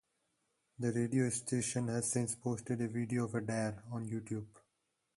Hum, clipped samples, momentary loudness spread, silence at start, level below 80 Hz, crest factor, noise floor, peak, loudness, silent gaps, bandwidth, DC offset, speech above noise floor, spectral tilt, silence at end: none; under 0.1%; 8 LU; 0.8 s; -70 dBFS; 16 dB; -83 dBFS; -22 dBFS; -37 LUFS; none; 12 kHz; under 0.1%; 47 dB; -5.5 dB/octave; 0.6 s